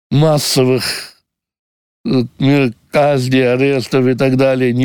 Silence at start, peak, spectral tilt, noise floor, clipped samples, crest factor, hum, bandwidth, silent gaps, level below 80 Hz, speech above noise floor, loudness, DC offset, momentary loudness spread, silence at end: 0.1 s; -2 dBFS; -5.5 dB/octave; -52 dBFS; under 0.1%; 12 dB; none; over 20 kHz; 1.59-2.04 s; -50 dBFS; 39 dB; -14 LUFS; under 0.1%; 6 LU; 0 s